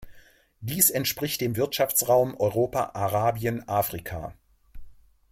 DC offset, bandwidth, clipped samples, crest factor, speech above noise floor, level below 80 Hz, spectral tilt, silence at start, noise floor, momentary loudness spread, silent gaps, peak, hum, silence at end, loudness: under 0.1%; 16.5 kHz; under 0.1%; 24 dB; 29 dB; -52 dBFS; -4 dB/octave; 0 s; -54 dBFS; 14 LU; none; -2 dBFS; none; 0.4 s; -25 LUFS